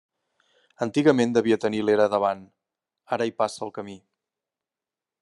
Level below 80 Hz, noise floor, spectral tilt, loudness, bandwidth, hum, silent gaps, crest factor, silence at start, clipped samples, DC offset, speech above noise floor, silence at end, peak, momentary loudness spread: -72 dBFS; -90 dBFS; -6 dB/octave; -24 LUFS; 11.5 kHz; none; none; 22 dB; 0.8 s; under 0.1%; under 0.1%; 67 dB; 1.25 s; -4 dBFS; 15 LU